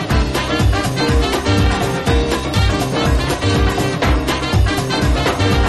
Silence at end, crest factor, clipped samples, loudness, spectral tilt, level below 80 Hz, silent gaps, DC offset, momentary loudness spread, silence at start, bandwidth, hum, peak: 0 s; 12 dB; under 0.1%; -16 LUFS; -5.5 dB/octave; -20 dBFS; none; under 0.1%; 2 LU; 0 s; 13.5 kHz; none; -2 dBFS